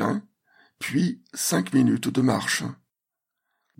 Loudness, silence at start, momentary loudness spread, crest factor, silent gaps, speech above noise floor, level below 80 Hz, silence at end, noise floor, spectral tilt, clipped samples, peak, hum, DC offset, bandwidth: -24 LUFS; 0 s; 10 LU; 18 dB; none; 62 dB; -68 dBFS; 1.05 s; -85 dBFS; -4.5 dB/octave; under 0.1%; -8 dBFS; none; under 0.1%; 16.5 kHz